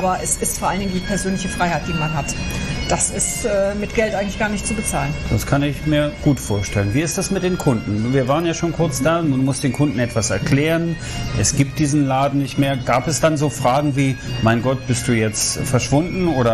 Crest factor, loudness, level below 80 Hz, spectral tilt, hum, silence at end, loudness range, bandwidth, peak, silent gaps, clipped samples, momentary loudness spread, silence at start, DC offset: 16 dB; -19 LUFS; -34 dBFS; -5 dB/octave; none; 0 s; 2 LU; 14 kHz; -2 dBFS; none; under 0.1%; 4 LU; 0 s; under 0.1%